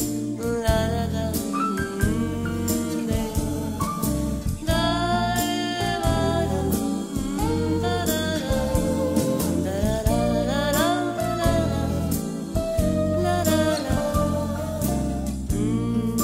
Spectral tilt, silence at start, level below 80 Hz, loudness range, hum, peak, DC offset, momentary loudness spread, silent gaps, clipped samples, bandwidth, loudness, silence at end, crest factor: -5.5 dB/octave; 0 s; -34 dBFS; 2 LU; none; -6 dBFS; 0.1%; 5 LU; none; under 0.1%; 16 kHz; -24 LUFS; 0 s; 18 dB